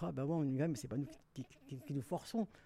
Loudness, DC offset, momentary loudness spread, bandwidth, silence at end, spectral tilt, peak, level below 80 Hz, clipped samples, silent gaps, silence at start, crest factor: -41 LUFS; under 0.1%; 15 LU; 15 kHz; 0.05 s; -7.5 dB/octave; -26 dBFS; -70 dBFS; under 0.1%; none; 0 s; 14 dB